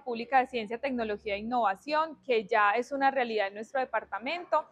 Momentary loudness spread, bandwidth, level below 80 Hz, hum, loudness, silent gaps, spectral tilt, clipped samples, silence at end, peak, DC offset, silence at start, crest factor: 8 LU; 10 kHz; -66 dBFS; none; -30 LUFS; none; -4.5 dB/octave; under 0.1%; 0.1 s; -12 dBFS; under 0.1%; 0.05 s; 18 dB